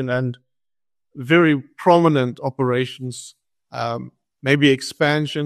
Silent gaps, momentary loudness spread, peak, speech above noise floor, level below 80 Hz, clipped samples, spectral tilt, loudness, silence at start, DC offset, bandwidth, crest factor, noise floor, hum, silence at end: none; 16 LU; -2 dBFS; over 71 dB; -62 dBFS; under 0.1%; -6 dB/octave; -19 LUFS; 0 s; under 0.1%; 13 kHz; 18 dB; under -90 dBFS; none; 0 s